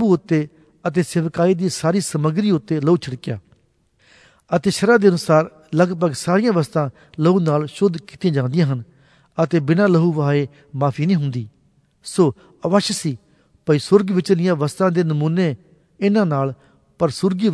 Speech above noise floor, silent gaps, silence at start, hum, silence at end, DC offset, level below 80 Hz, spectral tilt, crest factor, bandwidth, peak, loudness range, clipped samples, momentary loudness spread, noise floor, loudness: 43 dB; none; 0 s; none; 0 s; under 0.1%; -60 dBFS; -6.5 dB/octave; 18 dB; 11 kHz; 0 dBFS; 3 LU; under 0.1%; 12 LU; -61 dBFS; -19 LUFS